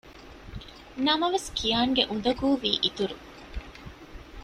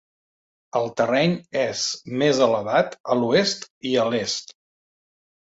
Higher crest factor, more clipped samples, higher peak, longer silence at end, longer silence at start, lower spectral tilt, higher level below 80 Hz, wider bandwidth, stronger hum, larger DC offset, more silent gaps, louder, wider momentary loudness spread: about the same, 22 dB vs 20 dB; neither; about the same, -6 dBFS vs -4 dBFS; second, 0 s vs 0.9 s; second, 0.05 s vs 0.75 s; about the same, -4 dB/octave vs -4 dB/octave; first, -46 dBFS vs -64 dBFS; first, 14 kHz vs 8 kHz; neither; neither; second, none vs 3.00-3.04 s, 3.70-3.81 s; second, -26 LUFS vs -22 LUFS; first, 22 LU vs 8 LU